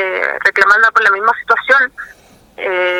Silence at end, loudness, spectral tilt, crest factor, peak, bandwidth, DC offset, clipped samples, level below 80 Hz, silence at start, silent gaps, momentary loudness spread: 0 s; -11 LUFS; -2 dB/octave; 14 dB; 0 dBFS; 16 kHz; under 0.1%; 0.1%; -56 dBFS; 0 s; none; 10 LU